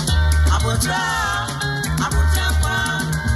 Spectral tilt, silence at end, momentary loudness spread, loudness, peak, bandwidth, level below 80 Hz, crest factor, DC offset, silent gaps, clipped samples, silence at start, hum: -4 dB/octave; 0 s; 4 LU; -19 LUFS; -6 dBFS; 13.5 kHz; -22 dBFS; 12 dB; under 0.1%; none; under 0.1%; 0 s; none